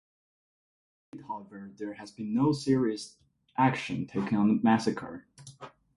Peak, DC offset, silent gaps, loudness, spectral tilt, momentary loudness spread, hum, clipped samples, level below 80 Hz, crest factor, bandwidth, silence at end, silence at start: -12 dBFS; under 0.1%; none; -28 LUFS; -6.5 dB/octave; 21 LU; none; under 0.1%; -66 dBFS; 20 dB; 11.5 kHz; 0.3 s; 1.15 s